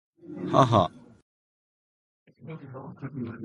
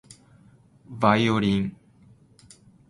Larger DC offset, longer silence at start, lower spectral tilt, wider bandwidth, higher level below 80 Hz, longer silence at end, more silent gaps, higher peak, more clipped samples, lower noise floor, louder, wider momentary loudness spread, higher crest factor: neither; second, 0.25 s vs 0.9 s; about the same, -7 dB/octave vs -6.5 dB/octave; about the same, 11 kHz vs 11.5 kHz; about the same, -56 dBFS vs -54 dBFS; second, 0 s vs 1.2 s; first, 1.22-2.26 s vs none; about the same, -4 dBFS vs -4 dBFS; neither; first, under -90 dBFS vs -55 dBFS; about the same, -25 LUFS vs -23 LUFS; first, 22 LU vs 13 LU; about the same, 26 dB vs 22 dB